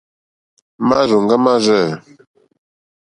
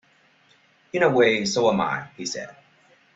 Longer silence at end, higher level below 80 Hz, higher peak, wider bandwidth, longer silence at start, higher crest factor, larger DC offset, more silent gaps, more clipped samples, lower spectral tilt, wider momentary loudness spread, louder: first, 1.15 s vs 0.65 s; first, -56 dBFS vs -64 dBFS; first, 0 dBFS vs -6 dBFS; first, 11 kHz vs 8 kHz; second, 0.8 s vs 0.95 s; about the same, 18 dB vs 18 dB; neither; neither; neither; first, -5.5 dB/octave vs -4 dB/octave; second, 8 LU vs 14 LU; first, -14 LUFS vs -22 LUFS